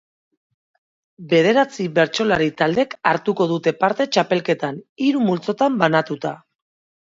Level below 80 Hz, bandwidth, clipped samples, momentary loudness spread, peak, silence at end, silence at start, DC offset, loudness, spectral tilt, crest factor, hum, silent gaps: -60 dBFS; 7.8 kHz; under 0.1%; 7 LU; 0 dBFS; 0.75 s; 1.2 s; under 0.1%; -19 LUFS; -5.5 dB/octave; 20 dB; none; 4.89-4.96 s